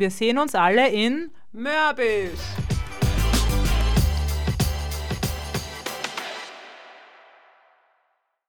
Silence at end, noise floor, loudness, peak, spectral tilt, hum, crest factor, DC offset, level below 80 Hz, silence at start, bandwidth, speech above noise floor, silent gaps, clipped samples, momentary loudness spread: 0 s; -71 dBFS; -23 LUFS; -6 dBFS; -5 dB/octave; none; 18 dB; under 0.1%; -28 dBFS; 0 s; over 20 kHz; 49 dB; none; under 0.1%; 13 LU